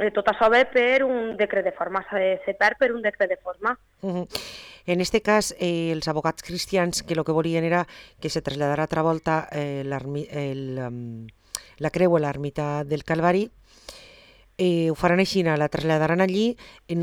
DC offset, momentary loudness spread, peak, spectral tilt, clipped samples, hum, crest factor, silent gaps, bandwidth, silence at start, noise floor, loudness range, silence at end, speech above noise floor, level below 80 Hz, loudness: under 0.1%; 13 LU; -6 dBFS; -5.5 dB/octave; under 0.1%; none; 18 dB; none; 18 kHz; 0 s; -52 dBFS; 4 LU; 0 s; 29 dB; -52 dBFS; -24 LUFS